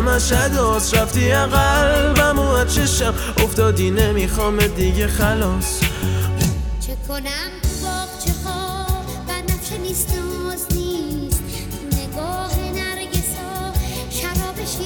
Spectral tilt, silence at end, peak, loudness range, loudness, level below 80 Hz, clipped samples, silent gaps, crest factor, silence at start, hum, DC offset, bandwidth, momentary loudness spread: -4.5 dB/octave; 0 s; -2 dBFS; 7 LU; -19 LUFS; -24 dBFS; under 0.1%; none; 18 dB; 0 s; none; under 0.1%; over 20 kHz; 9 LU